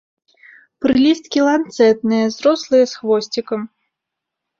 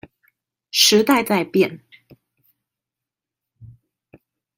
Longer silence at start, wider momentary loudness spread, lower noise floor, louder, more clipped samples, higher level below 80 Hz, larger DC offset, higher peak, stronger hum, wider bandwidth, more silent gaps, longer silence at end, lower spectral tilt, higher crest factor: about the same, 0.8 s vs 0.75 s; about the same, 9 LU vs 9 LU; second, -81 dBFS vs -87 dBFS; about the same, -16 LUFS vs -17 LUFS; neither; first, -56 dBFS vs -64 dBFS; neither; about the same, -2 dBFS vs 0 dBFS; neither; second, 7.6 kHz vs 16.5 kHz; neither; about the same, 0.95 s vs 0.9 s; first, -5 dB/octave vs -3 dB/octave; second, 14 dB vs 22 dB